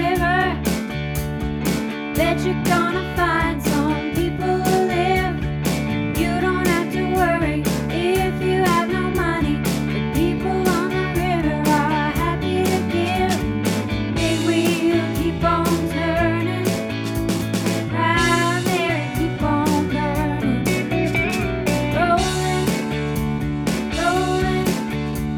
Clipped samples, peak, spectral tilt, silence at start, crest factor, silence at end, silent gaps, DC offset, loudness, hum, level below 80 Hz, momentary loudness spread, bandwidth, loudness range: under 0.1%; -4 dBFS; -5.5 dB/octave; 0 s; 16 dB; 0 s; none; under 0.1%; -20 LUFS; none; -34 dBFS; 5 LU; over 20 kHz; 1 LU